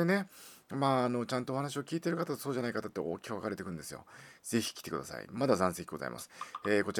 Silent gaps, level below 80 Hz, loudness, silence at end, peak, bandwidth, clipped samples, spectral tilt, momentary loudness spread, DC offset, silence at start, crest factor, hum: none; -70 dBFS; -35 LUFS; 0 s; -12 dBFS; over 20 kHz; under 0.1%; -5 dB/octave; 14 LU; under 0.1%; 0 s; 22 dB; none